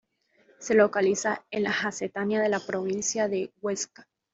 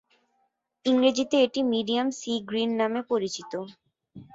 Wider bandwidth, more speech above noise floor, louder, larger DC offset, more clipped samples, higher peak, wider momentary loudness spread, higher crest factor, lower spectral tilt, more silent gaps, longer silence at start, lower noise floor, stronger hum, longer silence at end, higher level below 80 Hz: about the same, 8 kHz vs 7.8 kHz; second, 37 dB vs 48 dB; about the same, -27 LUFS vs -26 LUFS; neither; neither; about the same, -8 dBFS vs -10 dBFS; about the same, 9 LU vs 11 LU; about the same, 20 dB vs 18 dB; about the same, -3.5 dB/octave vs -4 dB/octave; neither; second, 0.6 s vs 0.85 s; second, -64 dBFS vs -74 dBFS; neither; first, 0.3 s vs 0.1 s; about the same, -70 dBFS vs -70 dBFS